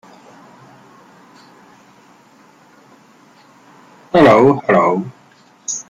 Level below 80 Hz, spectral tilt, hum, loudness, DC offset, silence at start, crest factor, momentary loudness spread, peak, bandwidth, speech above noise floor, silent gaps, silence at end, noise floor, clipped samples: -54 dBFS; -5.5 dB/octave; none; -12 LUFS; under 0.1%; 4.15 s; 18 dB; 19 LU; 0 dBFS; 10.5 kHz; 38 dB; none; 0.1 s; -49 dBFS; under 0.1%